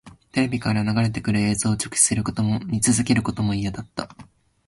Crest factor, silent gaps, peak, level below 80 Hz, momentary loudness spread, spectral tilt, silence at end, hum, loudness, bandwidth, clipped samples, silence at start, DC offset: 18 dB; none; -4 dBFS; -46 dBFS; 11 LU; -4.5 dB/octave; 0.45 s; none; -22 LUFS; 11.5 kHz; under 0.1%; 0.05 s; under 0.1%